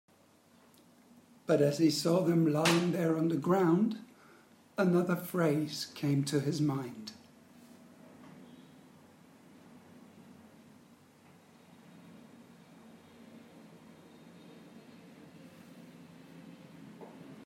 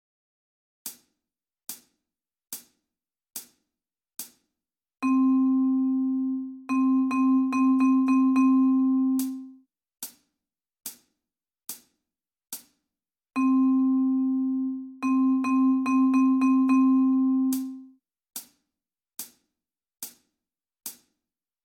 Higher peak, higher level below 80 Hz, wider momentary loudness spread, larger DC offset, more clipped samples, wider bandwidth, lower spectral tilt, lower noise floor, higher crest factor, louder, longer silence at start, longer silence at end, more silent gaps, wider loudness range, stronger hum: about the same, -14 dBFS vs -14 dBFS; second, -80 dBFS vs -74 dBFS; first, 27 LU vs 20 LU; neither; neither; about the same, 16 kHz vs 17.5 kHz; first, -6 dB/octave vs -4 dB/octave; second, -64 dBFS vs under -90 dBFS; first, 20 dB vs 14 dB; second, -30 LUFS vs -23 LUFS; first, 1.5 s vs 0.85 s; second, 0.05 s vs 0.7 s; neither; first, 25 LU vs 21 LU; neither